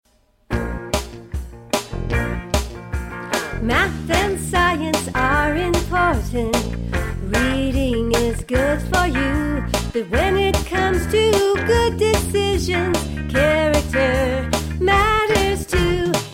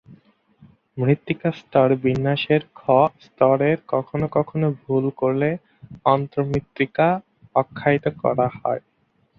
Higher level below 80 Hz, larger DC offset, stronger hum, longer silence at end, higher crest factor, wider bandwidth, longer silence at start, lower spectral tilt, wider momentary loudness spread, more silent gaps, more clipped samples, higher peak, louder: first, -28 dBFS vs -54 dBFS; neither; neither; second, 0 s vs 0.6 s; about the same, 16 dB vs 20 dB; first, 16.5 kHz vs 6.6 kHz; first, 0.5 s vs 0.1 s; second, -5 dB/octave vs -9 dB/octave; about the same, 8 LU vs 7 LU; neither; neither; about the same, -4 dBFS vs -2 dBFS; about the same, -19 LUFS vs -21 LUFS